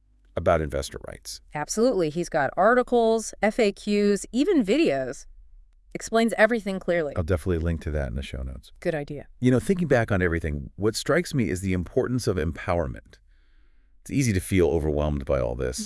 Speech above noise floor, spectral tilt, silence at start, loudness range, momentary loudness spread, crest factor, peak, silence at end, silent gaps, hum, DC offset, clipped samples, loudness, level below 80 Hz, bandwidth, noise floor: 31 dB; -6 dB/octave; 0.35 s; 4 LU; 13 LU; 18 dB; -6 dBFS; 0 s; none; none; under 0.1%; under 0.1%; -25 LUFS; -40 dBFS; 12 kHz; -56 dBFS